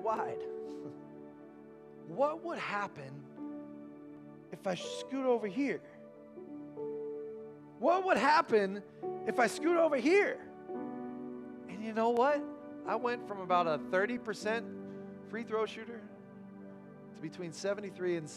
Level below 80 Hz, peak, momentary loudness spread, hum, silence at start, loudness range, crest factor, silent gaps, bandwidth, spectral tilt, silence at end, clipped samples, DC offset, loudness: -80 dBFS; -16 dBFS; 22 LU; none; 0 s; 10 LU; 20 dB; none; 13.5 kHz; -5 dB/octave; 0 s; under 0.1%; under 0.1%; -34 LUFS